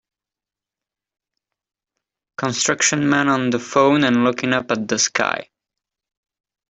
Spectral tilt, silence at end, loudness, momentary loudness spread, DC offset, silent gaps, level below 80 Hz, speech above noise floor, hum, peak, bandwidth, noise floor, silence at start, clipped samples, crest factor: -3.5 dB/octave; 1.25 s; -18 LUFS; 8 LU; under 0.1%; none; -62 dBFS; 71 dB; none; -2 dBFS; 8.4 kHz; -89 dBFS; 2.4 s; under 0.1%; 20 dB